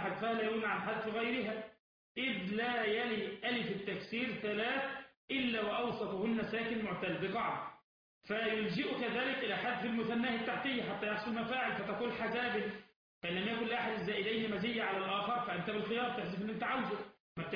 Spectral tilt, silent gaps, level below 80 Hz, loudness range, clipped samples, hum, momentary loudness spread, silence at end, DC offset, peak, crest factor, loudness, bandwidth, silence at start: -7 dB/octave; 1.79-2.15 s, 5.17-5.28 s, 7.84-8.21 s, 12.96-13.21 s, 17.20-17.36 s; -72 dBFS; 1 LU; under 0.1%; none; 5 LU; 0 s; under 0.1%; -24 dBFS; 14 dB; -37 LUFS; 5.2 kHz; 0 s